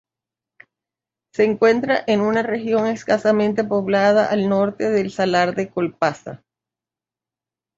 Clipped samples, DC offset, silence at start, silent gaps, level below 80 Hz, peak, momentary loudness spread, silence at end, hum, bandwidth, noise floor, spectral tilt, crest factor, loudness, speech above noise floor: under 0.1%; under 0.1%; 1.4 s; none; -62 dBFS; -4 dBFS; 7 LU; 1.4 s; none; 7.8 kHz; -89 dBFS; -6 dB/octave; 16 dB; -19 LUFS; 71 dB